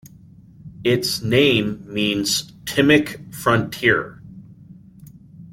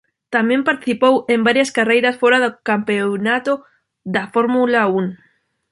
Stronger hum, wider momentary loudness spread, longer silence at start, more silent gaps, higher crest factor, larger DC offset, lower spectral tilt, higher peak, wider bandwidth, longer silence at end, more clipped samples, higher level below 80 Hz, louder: neither; about the same, 9 LU vs 8 LU; first, 0.65 s vs 0.3 s; neither; about the same, 20 dB vs 16 dB; neither; about the same, -4.5 dB/octave vs -5 dB/octave; about the same, -2 dBFS vs -2 dBFS; first, 16.5 kHz vs 11.5 kHz; second, 0 s vs 0.55 s; neither; first, -52 dBFS vs -64 dBFS; about the same, -19 LUFS vs -17 LUFS